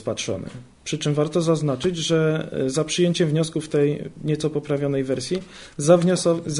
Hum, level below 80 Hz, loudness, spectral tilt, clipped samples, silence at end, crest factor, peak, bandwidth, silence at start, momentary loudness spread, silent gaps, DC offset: none; -54 dBFS; -22 LUFS; -5.5 dB/octave; under 0.1%; 0 s; 18 dB; -4 dBFS; 11 kHz; 0 s; 11 LU; none; under 0.1%